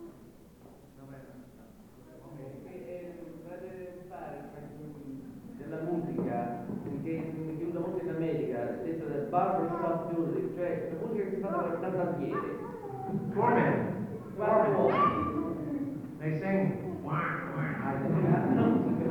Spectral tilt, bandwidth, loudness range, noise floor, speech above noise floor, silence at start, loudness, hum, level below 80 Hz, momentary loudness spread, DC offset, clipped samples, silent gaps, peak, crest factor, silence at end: -9.5 dB/octave; 19.5 kHz; 16 LU; -54 dBFS; 25 dB; 0 s; -32 LUFS; none; -64 dBFS; 19 LU; under 0.1%; under 0.1%; none; -12 dBFS; 20 dB; 0 s